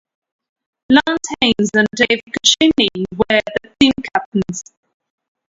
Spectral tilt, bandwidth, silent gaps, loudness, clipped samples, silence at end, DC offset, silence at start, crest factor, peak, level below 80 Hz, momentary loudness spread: -3 dB/octave; 11 kHz; 4.26-4.32 s; -15 LUFS; under 0.1%; 0.85 s; under 0.1%; 0.9 s; 18 dB; 0 dBFS; -48 dBFS; 9 LU